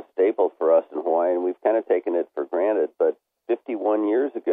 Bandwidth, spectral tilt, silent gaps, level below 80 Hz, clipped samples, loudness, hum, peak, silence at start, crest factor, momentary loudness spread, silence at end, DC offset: 3.8 kHz; -8.5 dB/octave; none; -86 dBFS; under 0.1%; -23 LUFS; none; -8 dBFS; 0.15 s; 16 dB; 7 LU; 0 s; under 0.1%